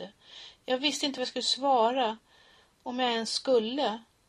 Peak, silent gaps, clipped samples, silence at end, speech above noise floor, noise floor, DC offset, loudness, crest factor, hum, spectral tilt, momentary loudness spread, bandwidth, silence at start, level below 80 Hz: -12 dBFS; none; under 0.1%; 0.25 s; 32 dB; -61 dBFS; under 0.1%; -28 LUFS; 18 dB; none; -2 dB/octave; 19 LU; 14.5 kHz; 0 s; -74 dBFS